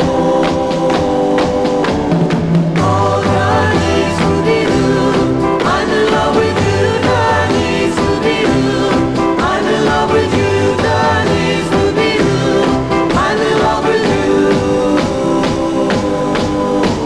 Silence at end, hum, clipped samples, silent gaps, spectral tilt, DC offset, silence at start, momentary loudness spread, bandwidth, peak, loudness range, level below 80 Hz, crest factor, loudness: 0 s; none; under 0.1%; none; -6 dB/octave; under 0.1%; 0 s; 2 LU; 11 kHz; -2 dBFS; 1 LU; -32 dBFS; 10 dB; -13 LUFS